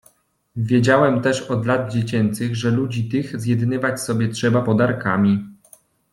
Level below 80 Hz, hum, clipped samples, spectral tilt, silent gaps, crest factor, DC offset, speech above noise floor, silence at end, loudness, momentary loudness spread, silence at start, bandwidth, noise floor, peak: -56 dBFS; none; under 0.1%; -6.5 dB/octave; none; 16 dB; under 0.1%; 39 dB; 0.6 s; -20 LUFS; 8 LU; 0.55 s; 12.5 kHz; -57 dBFS; -2 dBFS